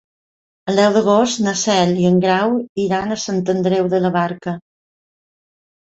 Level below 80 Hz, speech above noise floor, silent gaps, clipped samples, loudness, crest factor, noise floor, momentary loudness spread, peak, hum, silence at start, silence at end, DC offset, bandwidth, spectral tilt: -56 dBFS; over 74 dB; 2.69-2.75 s; under 0.1%; -17 LUFS; 16 dB; under -90 dBFS; 8 LU; -2 dBFS; none; 0.65 s; 1.25 s; under 0.1%; 8 kHz; -5 dB/octave